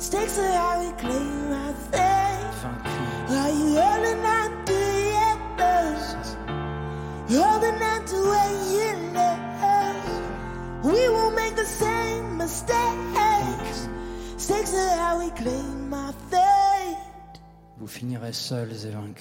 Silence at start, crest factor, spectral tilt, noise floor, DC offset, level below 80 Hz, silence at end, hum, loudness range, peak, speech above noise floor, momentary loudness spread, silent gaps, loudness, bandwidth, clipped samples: 0 s; 16 dB; -4.5 dB/octave; -47 dBFS; under 0.1%; -42 dBFS; 0 s; none; 3 LU; -10 dBFS; 21 dB; 12 LU; none; -24 LUFS; 16.5 kHz; under 0.1%